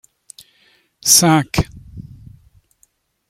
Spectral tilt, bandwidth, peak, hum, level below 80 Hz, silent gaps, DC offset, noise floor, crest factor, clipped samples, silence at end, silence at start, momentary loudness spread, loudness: -3 dB/octave; 16.5 kHz; 0 dBFS; none; -42 dBFS; none; under 0.1%; -61 dBFS; 20 dB; under 0.1%; 1.25 s; 1.05 s; 28 LU; -14 LUFS